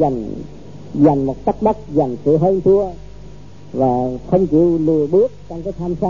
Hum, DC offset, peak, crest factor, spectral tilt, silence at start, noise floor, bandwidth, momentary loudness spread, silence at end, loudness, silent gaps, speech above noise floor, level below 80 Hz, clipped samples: 50 Hz at -40 dBFS; 1%; -2 dBFS; 14 dB; -10.5 dB/octave; 0 s; -38 dBFS; 7.2 kHz; 14 LU; 0 s; -16 LUFS; none; 22 dB; -40 dBFS; under 0.1%